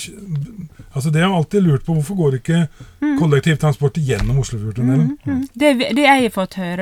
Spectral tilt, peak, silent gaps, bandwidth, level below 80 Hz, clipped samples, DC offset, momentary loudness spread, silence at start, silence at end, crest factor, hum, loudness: -6.5 dB/octave; 0 dBFS; none; 15 kHz; -36 dBFS; under 0.1%; under 0.1%; 11 LU; 0 s; 0 s; 16 dB; none; -17 LUFS